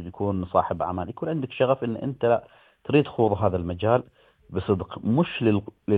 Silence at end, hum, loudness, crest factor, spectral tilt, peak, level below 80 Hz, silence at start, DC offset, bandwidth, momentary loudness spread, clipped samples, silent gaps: 0 s; none; -25 LUFS; 20 dB; -10 dB/octave; -6 dBFS; -54 dBFS; 0 s; under 0.1%; 4.7 kHz; 7 LU; under 0.1%; none